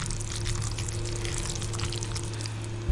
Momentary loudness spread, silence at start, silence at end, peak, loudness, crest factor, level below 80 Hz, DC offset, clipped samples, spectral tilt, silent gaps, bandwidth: 3 LU; 0 s; 0 s; -14 dBFS; -32 LUFS; 18 dB; -38 dBFS; under 0.1%; under 0.1%; -4 dB/octave; none; 11.5 kHz